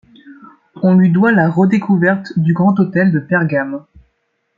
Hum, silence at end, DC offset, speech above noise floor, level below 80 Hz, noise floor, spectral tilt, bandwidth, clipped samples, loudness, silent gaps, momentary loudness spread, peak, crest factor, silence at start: none; 0.8 s; under 0.1%; 54 dB; -56 dBFS; -66 dBFS; -10 dB/octave; 5.2 kHz; under 0.1%; -13 LUFS; none; 7 LU; -2 dBFS; 12 dB; 0.25 s